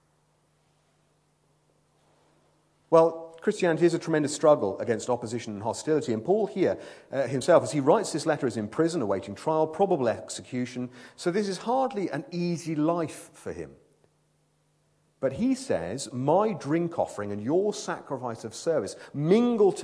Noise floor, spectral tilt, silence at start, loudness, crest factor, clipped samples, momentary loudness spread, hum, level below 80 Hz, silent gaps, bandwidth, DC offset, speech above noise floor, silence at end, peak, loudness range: -69 dBFS; -6 dB/octave; 2.9 s; -27 LUFS; 20 dB; under 0.1%; 12 LU; none; -68 dBFS; none; 11 kHz; under 0.1%; 43 dB; 0 s; -6 dBFS; 6 LU